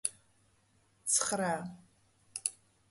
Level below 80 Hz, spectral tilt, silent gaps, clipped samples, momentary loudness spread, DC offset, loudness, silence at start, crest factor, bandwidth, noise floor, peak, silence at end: -76 dBFS; -2 dB/octave; none; under 0.1%; 15 LU; under 0.1%; -33 LUFS; 0.05 s; 28 dB; 12 kHz; -70 dBFS; -12 dBFS; 0.4 s